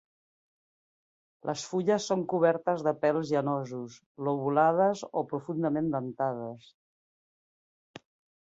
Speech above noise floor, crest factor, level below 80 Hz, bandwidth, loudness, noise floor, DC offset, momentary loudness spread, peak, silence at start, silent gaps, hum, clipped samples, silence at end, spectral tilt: over 61 dB; 20 dB; -74 dBFS; 8 kHz; -29 LUFS; under -90 dBFS; under 0.1%; 14 LU; -10 dBFS; 1.45 s; 4.06-4.15 s; none; under 0.1%; 1.9 s; -6 dB/octave